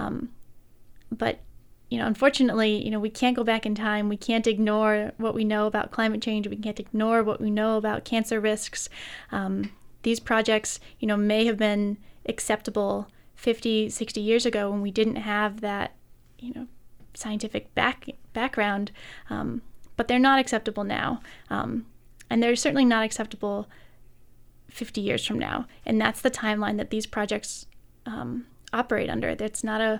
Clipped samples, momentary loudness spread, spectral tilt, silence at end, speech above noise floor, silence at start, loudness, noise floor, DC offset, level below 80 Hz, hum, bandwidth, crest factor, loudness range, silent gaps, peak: under 0.1%; 14 LU; -4.5 dB/octave; 0 s; 25 dB; 0 s; -26 LUFS; -51 dBFS; under 0.1%; -52 dBFS; none; 15.5 kHz; 22 dB; 5 LU; none; -4 dBFS